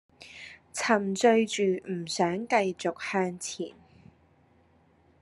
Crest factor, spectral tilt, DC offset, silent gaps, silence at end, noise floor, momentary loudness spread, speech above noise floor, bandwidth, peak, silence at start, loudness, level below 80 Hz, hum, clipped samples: 22 dB; -4 dB/octave; under 0.1%; none; 1.5 s; -63 dBFS; 19 LU; 36 dB; 12.5 kHz; -8 dBFS; 0.2 s; -28 LUFS; -74 dBFS; none; under 0.1%